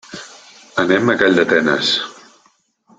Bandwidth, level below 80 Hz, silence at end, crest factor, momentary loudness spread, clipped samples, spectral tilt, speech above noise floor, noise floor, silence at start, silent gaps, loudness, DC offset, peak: 9.4 kHz; -58 dBFS; 0.85 s; 18 dB; 18 LU; under 0.1%; -4 dB/octave; 43 dB; -58 dBFS; 0.1 s; none; -15 LUFS; under 0.1%; 0 dBFS